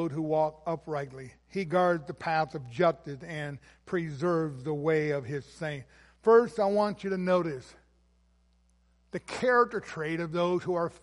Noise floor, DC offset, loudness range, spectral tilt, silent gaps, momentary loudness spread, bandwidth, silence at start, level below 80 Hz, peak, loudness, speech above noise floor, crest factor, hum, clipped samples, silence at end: -66 dBFS; under 0.1%; 4 LU; -7 dB/octave; none; 14 LU; 11.5 kHz; 0 s; -64 dBFS; -10 dBFS; -29 LUFS; 37 dB; 20 dB; none; under 0.1%; 0.05 s